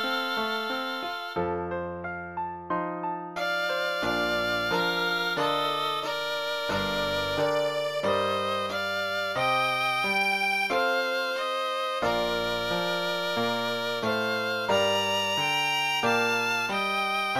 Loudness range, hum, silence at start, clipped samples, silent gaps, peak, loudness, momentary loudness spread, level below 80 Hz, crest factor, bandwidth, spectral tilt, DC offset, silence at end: 4 LU; none; 0 s; under 0.1%; none; -12 dBFS; -27 LUFS; 7 LU; -58 dBFS; 16 dB; 16.5 kHz; -3.5 dB/octave; under 0.1%; 0 s